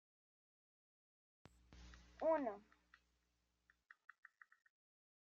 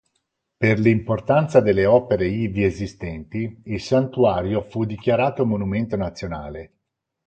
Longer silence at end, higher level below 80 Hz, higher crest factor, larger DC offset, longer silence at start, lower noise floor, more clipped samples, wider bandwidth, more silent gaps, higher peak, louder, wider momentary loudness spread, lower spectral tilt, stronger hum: first, 2.7 s vs 0.6 s; second, -74 dBFS vs -44 dBFS; about the same, 24 dB vs 20 dB; neither; first, 1.7 s vs 0.6 s; first, -86 dBFS vs -74 dBFS; neither; second, 7.4 kHz vs 8.8 kHz; neither; second, -28 dBFS vs -2 dBFS; second, -42 LUFS vs -21 LUFS; first, 26 LU vs 13 LU; second, -4.5 dB/octave vs -8 dB/octave; first, 60 Hz at -75 dBFS vs none